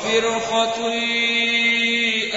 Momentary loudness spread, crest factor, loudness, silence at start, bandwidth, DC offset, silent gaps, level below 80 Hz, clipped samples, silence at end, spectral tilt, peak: 4 LU; 14 dB; -18 LUFS; 0 s; 8 kHz; under 0.1%; none; -58 dBFS; under 0.1%; 0 s; -1.5 dB/octave; -6 dBFS